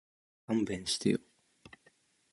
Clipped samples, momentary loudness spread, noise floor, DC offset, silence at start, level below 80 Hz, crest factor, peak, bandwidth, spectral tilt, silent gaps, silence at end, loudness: under 0.1%; 4 LU; -69 dBFS; under 0.1%; 0.5 s; -66 dBFS; 22 dB; -16 dBFS; 11.5 kHz; -4.5 dB/octave; none; 1.15 s; -33 LUFS